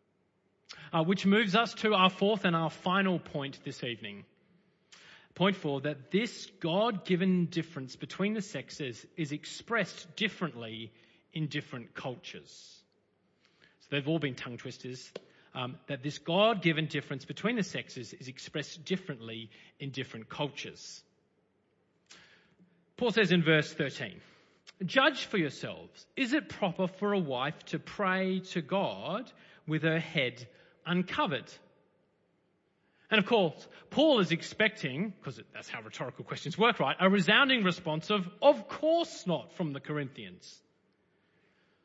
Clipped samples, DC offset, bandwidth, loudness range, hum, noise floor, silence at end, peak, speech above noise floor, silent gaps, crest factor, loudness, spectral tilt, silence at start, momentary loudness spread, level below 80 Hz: under 0.1%; under 0.1%; 8 kHz; 10 LU; none; -74 dBFS; 1.3 s; -10 dBFS; 42 dB; none; 24 dB; -31 LUFS; -5.5 dB/octave; 0.7 s; 18 LU; -76 dBFS